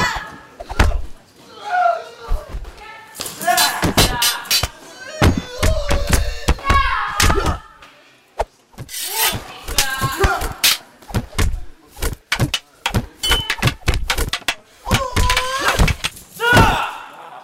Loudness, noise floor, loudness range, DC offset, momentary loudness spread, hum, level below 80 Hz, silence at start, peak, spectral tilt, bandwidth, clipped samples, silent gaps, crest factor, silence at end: -18 LUFS; -49 dBFS; 3 LU; under 0.1%; 15 LU; none; -26 dBFS; 0 s; 0 dBFS; -3 dB/octave; 16.5 kHz; under 0.1%; none; 18 dB; 0 s